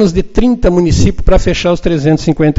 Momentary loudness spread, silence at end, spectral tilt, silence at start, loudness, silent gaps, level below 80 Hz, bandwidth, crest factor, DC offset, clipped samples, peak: 2 LU; 0 s; -6.5 dB/octave; 0 s; -11 LUFS; none; -18 dBFS; 8 kHz; 10 dB; under 0.1%; 0.3%; 0 dBFS